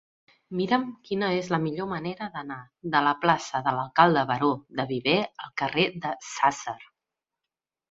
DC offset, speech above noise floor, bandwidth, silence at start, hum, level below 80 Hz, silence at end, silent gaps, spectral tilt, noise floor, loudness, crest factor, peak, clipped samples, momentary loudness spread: under 0.1%; 63 dB; 8 kHz; 0.5 s; none; -66 dBFS; 1.1 s; none; -5 dB/octave; -89 dBFS; -26 LUFS; 24 dB; -4 dBFS; under 0.1%; 14 LU